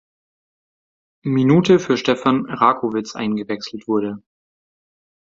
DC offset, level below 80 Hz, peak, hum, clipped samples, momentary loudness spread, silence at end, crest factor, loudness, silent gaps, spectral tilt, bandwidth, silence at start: under 0.1%; -60 dBFS; 0 dBFS; none; under 0.1%; 13 LU; 1.2 s; 20 dB; -18 LUFS; none; -6.5 dB/octave; 7.8 kHz; 1.25 s